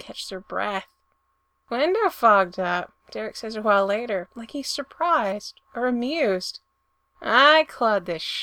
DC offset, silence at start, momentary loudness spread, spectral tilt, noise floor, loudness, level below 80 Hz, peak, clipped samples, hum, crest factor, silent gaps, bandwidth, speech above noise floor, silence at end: under 0.1%; 0.05 s; 16 LU; -3.5 dB/octave; -72 dBFS; -23 LUFS; -64 dBFS; -2 dBFS; under 0.1%; none; 22 dB; none; 19 kHz; 48 dB; 0 s